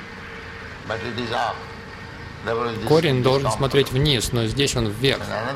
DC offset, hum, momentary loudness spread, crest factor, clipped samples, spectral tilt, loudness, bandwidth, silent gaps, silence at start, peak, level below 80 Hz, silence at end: under 0.1%; none; 16 LU; 18 dB; under 0.1%; -5 dB/octave; -21 LUFS; 16 kHz; none; 0 s; -6 dBFS; -40 dBFS; 0 s